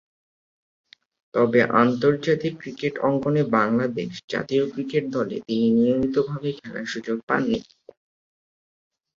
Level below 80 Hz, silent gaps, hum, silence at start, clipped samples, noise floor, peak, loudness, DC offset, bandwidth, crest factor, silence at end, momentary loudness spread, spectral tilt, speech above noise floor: -60 dBFS; 4.24-4.28 s, 7.23-7.27 s; none; 1.35 s; under 0.1%; under -90 dBFS; -2 dBFS; -23 LUFS; under 0.1%; 7.4 kHz; 20 dB; 1.55 s; 10 LU; -7 dB/octave; over 68 dB